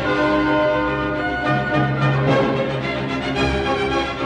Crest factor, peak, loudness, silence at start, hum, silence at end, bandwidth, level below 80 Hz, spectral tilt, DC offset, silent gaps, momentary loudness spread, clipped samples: 14 dB; -4 dBFS; -19 LUFS; 0 s; none; 0 s; 9.6 kHz; -36 dBFS; -6.5 dB/octave; under 0.1%; none; 5 LU; under 0.1%